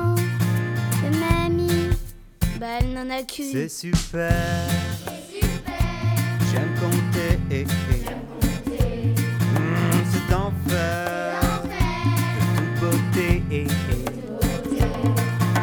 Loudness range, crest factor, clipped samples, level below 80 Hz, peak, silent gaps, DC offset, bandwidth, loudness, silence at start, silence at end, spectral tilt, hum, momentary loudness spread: 3 LU; 18 dB; under 0.1%; -32 dBFS; -4 dBFS; none; under 0.1%; over 20 kHz; -23 LUFS; 0 s; 0 s; -6 dB/octave; none; 6 LU